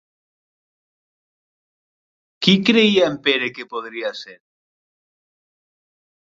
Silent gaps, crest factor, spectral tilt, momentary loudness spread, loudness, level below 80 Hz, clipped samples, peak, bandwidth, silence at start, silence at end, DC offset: none; 22 dB; -5.5 dB/octave; 15 LU; -17 LUFS; -64 dBFS; under 0.1%; 0 dBFS; 7.8 kHz; 2.4 s; 2.05 s; under 0.1%